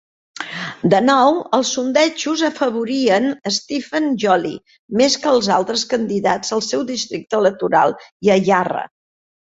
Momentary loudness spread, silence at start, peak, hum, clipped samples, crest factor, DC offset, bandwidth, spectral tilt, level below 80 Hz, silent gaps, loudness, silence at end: 10 LU; 0.4 s; -2 dBFS; none; under 0.1%; 16 dB; under 0.1%; 8 kHz; -4 dB/octave; -60 dBFS; 4.79-4.88 s, 8.12-8.20 s; -17 LUFS; 0.7 s